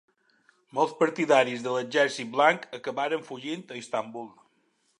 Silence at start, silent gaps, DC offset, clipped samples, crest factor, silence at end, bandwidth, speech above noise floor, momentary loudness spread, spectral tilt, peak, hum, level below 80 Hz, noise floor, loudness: 0.75 s; none; under 0.1%; under 0.1%; 22 dB; 0.7 s; 11 kHz; 44 dB; 13 LU; -4 dB/octave; -6 dBFS; none; -84 dBFS; -70 dBFS; -27 LUFS